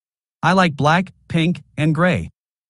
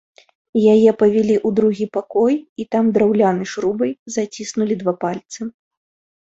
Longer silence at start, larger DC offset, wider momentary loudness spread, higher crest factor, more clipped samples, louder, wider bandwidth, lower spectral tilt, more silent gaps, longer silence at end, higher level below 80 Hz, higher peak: about the same, 0.45 s vs 0.55 s; neither; second, 8 LU vs 11 LU; about the same, 18 dB vs 16 dB; neither; about the same, -18 LUFS vs -18 LUFS; first, 11.5 kHz vs 8 kHz; about the same, -6.5 dB/octave vs -6.5 dB/octave; second, none vs 2.49-2.56 s, 3.99-4.06 s; second, 0.4 s vs 0.8 s; first, -48 dBFS vs -60 dBFS; about the same, -2 dBFS vs -2 dBFS